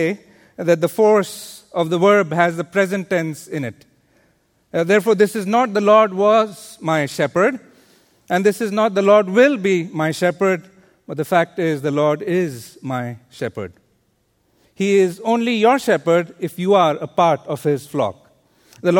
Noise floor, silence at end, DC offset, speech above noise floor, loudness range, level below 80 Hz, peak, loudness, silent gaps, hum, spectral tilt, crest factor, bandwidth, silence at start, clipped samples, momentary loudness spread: -64 dBFS; 0 s; under 0.1%; 46 dB; 5 LU; -64 dBFS; 0 dBFS; -18 LUFS; none; none; -6 dB/octave; 18 dB; 18 kHz; 0 s; under 0.1%; 13 LU